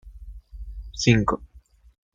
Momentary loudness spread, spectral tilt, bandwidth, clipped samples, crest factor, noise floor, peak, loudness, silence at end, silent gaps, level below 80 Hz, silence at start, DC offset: 25 LU; -5.5 dB/octave; 7.8 kHz; under 0.1%; 22 dB; -42 dBFS; -4 dBFS; -22 LUFS; 0.55 s; none; -40 dBFS; 0.05 s; under 0.1%